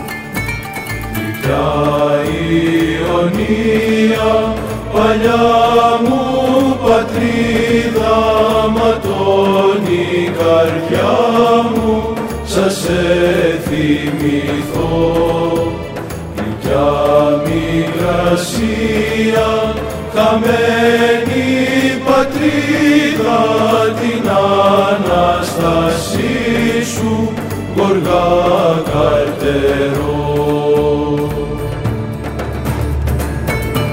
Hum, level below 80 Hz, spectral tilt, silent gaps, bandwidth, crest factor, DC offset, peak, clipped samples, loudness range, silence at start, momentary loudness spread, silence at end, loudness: none; -30 dBFS; -6 dB/octave; none; 16.5 kHz; 12 dB; under 0.1%; 0 dBFS; under 0.1%; 3 LU; 0 s; 8 LU; 0 s; -14 LUFS